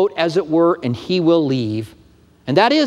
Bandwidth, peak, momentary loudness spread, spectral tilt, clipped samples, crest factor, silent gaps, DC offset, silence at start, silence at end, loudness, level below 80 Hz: 10.5 kHz; 0 dBFS; 11 LU; -6.5 dB/octave; under 0.1%; 16 dB; none; under 0.1%; 0 s; 0 s; -17 LUFS; -56 dBFS